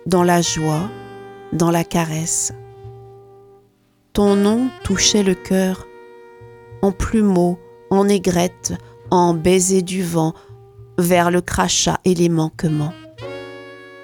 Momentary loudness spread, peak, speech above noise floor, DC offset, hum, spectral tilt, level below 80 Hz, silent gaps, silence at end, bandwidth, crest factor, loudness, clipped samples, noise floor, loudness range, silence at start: 18 LU; -2 dBFS; 41 dB; under 0.1%; none; -4.5 dB/octave; -40 dBFS; none; 0 s; 18 kHz; 18 dB; -18 LUFS; under 0.1%; -58 dBFS; 4 LU; 0.05 s